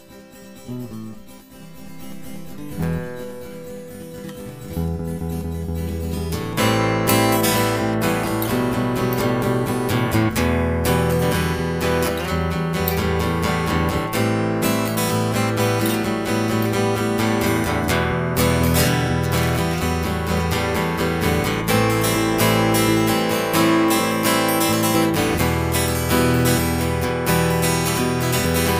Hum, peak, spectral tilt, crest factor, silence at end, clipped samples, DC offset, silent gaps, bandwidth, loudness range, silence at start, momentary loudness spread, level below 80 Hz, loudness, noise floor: none; -6 dBFS; -5 dB/octave; 14 dB; 0 s; under 0.1%; 0.2%; none; 16 kHz; 11 LU; 0.1 s; 16 LU; -36 dBFS; -20 LUFS; -42 dBFS